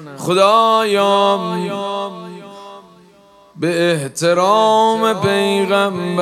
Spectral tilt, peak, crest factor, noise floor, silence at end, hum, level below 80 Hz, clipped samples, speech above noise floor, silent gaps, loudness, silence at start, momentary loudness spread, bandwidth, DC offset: -4.5 dB/octave; 0 dBFS; 16 dB; -47 dBFS; 0 s; none; -66 dBFS; under 0.1%; 32 dB; none; -15 LUFS; 0 s; 15 LU; 15 kHz; under 0.1%